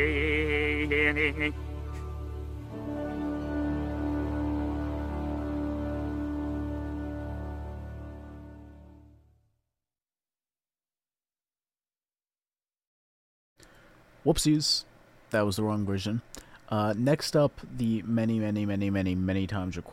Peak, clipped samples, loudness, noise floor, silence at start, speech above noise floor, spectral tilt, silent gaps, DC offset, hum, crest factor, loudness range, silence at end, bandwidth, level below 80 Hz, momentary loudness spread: -12 dBFS; under 0.1%; -30 LUFS; under -90 dBFS; 0 s; over 63 dB; -5.5 dB/octave; 12.87-13.56 s; under 0.1%; none; 20 dB; 12 LU; 0 s; 16 kHz; -42 dBFS; 14 LU